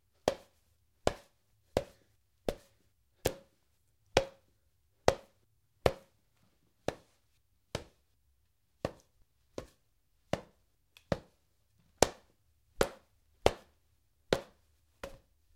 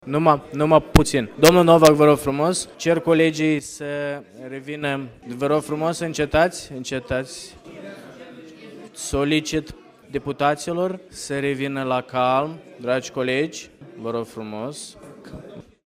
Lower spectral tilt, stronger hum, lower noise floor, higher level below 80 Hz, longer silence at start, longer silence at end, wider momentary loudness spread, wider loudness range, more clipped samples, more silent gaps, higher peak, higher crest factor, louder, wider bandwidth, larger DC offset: about the same, -4 dB/octave vs -5 dB/octave; neither; first, -76 dBFS vs -41 dBFS; second, -54 dBFS vs -42 dBFS; first, 0.25 s vs 0.05 s; first, 0.45 s vs 0.25 s; second, 17 LU vs 23 LU; about the same, 11 LU vs 11 LU; neither; neither; about the same, 0 dBFS vs 0 dBFS; first, 40 dB vs 22 dB; second, -36 LUFS vs -21 LUFS; about the same, 16 kHz vs 16 kHz; neither